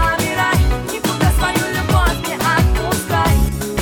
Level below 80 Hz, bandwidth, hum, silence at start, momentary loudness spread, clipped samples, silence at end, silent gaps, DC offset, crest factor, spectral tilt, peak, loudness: -22 dBFS; 18.5 kHz; none; 0 s; 4 LU; under 0.1%; 0 s; none; under 0.1%; 12 dB; -4.5 dB/octave; -4 dBFS; -17 LUFS